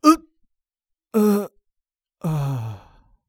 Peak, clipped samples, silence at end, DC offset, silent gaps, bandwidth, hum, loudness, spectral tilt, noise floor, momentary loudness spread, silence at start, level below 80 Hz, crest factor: 0 dBFS; under 0.1%; 0.5 s; under 0.1%; none; 18.5 kHz; none; -22 LUFS; -6.5 dB/octave; -83 dBFS; 16 LU; 0.05 s; -54 dBFS; 24 dB